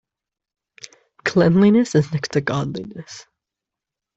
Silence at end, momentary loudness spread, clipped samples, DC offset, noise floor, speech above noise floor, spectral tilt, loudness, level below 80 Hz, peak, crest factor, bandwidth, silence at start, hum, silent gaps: 0.95 s; 21 LU; under 0.1%; under 0.1%; -86 dBFS; 68 dB; -6.5 dB/octave; -18 LUFS; -56 dBFS; -4 dBFS; 18 dB; 8 kHz; 1.25 s; none; none